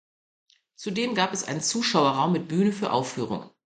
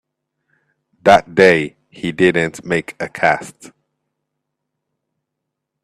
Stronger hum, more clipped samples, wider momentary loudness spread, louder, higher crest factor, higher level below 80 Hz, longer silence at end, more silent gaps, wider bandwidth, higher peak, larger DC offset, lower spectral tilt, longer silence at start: neither; neither; second, 10 LU vs 15 LU; second, -25 LUFS vs -15 LUFS; about the same, 20 dB vs 18 dB; second, -68 dBFS vs -54 dBFS; second, 0.3 s vs 2.35 s; neither; second, 9.6 kHz vs 13.5 kHz; second, -8 dBFS vs 0 dBFS; neither; second, -4 dB/octave vs -5.5 dB/octave; second, 0.8 s vs 1.05 s